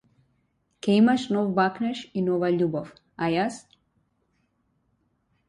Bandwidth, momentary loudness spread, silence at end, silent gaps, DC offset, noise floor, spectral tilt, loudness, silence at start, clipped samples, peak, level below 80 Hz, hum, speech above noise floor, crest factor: 11 kHz; 12 LU; 1.9 s; none; under 0.1%; -71 dBFS; -6.5 dB/octave; -25 LUFS; 0.85 s; under 0.1%; -10 dBFS; -66 dBFS; none; 48 dB; 18 dB